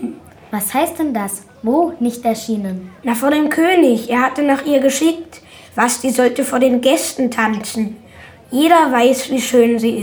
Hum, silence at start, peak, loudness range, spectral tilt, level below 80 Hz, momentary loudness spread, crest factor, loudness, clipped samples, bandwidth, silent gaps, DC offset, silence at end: none; 0 s; 0 dBFS; 3 LU; -3.5 dB/octave; -56 dBFS; 12 LU; 16 dB; -16 LUFS; under 0.1%; over 20 kHz; none; under 0.1%; 0 s